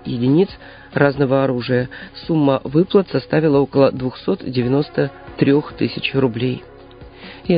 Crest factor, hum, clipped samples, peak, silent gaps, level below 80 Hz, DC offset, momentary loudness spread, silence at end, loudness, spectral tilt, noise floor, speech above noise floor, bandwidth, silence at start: 18 dB; none; under 0.1%; 0 dBFS; none; -46 dBFS; under 0.1%; 12 LU; 0 s; -18 LUFS; -12.5 dB/octave; -40 dBFS; 22 dB; 5.2 kHz; 0.05 s